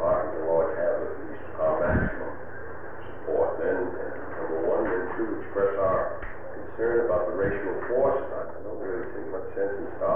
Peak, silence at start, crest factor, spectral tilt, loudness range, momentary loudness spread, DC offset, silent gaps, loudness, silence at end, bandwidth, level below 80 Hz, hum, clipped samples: -12 dBFS; 0 s; 14 dB; -10.5 dB/octave; 2 LU; 13 LU; 2%; none; -28 LUFS; 0 s; 3.5 kHz; -46 dBFS; none; under 0.1%